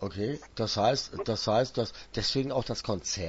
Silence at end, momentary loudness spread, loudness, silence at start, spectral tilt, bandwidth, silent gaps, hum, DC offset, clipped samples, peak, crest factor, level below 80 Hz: 0 s; 7 LU; -30 LUFS; 0 s; -4.5 dB/octave; 8 kHz; none; none; under 0.1%; under 0.1%; -12 dBFS; 18 dB; -52 dBFS